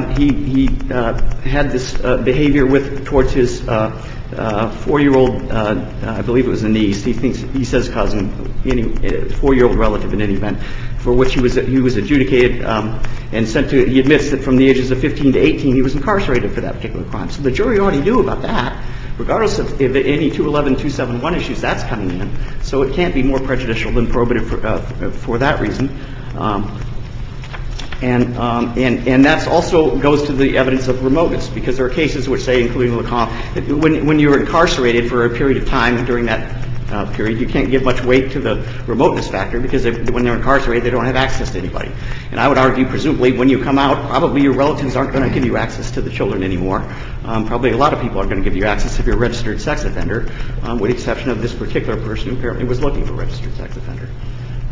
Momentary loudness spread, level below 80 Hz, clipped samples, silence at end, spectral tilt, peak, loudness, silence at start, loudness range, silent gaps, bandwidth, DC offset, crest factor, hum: 11 LU; -24 dBFS; under 0.1%; 0 s; -6.5 dB/octave; 0 dBFS; -16 LUFS; 0 s; 5 LU; none; 7.6 kHz; under 0.1%; 14 dB; none